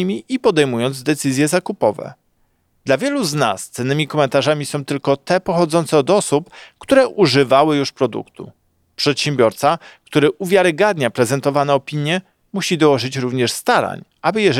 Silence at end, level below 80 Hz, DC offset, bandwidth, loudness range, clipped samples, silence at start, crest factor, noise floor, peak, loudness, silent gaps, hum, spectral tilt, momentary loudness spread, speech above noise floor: 0 s; -60 dBFS; under 0.1%; 16 kHz; 3 LU; under 0.1%; 0 s; 16 dB; -62 dBFS; -2 dBFS; -17 LUFS; none; none; -5 dB/octave; 8 LU; 45 dB